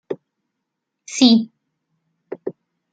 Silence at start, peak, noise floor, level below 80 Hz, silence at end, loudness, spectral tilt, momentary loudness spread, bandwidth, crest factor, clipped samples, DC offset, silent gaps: 0.1 s; -2 dBFS; -79 dBFS; -74 dBFS; 0.4 s; -16 LUFS; -4 dB/octave; 20 LU; 9.2 kHz; 20 dB; under 0.1%; under 0.1%; none